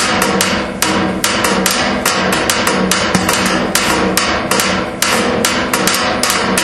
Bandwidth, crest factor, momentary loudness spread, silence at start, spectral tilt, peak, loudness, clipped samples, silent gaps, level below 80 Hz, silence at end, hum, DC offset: 17.5 kHz; 14 dB; 2 LU; 0 s; -2.5 dB/octave; 0 dBFS; -13 LUFS; under 0.1%; none; -36 dBFS; 0 s; none; under 0.1%